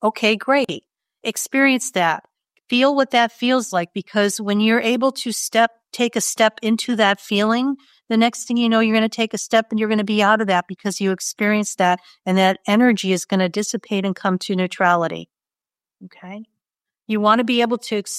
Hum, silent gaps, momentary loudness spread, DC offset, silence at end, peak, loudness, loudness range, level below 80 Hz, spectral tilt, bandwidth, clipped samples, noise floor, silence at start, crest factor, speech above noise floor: none; none; 8 LU; under 0.1%; 0 s; -2 dBFS; -19 LUFS; 4 LU; -72 dBFS; -4 dB/octave; 15 kHz; under 0.1%; under -90 dBFS; 0 s; 18 dB; over 71 dB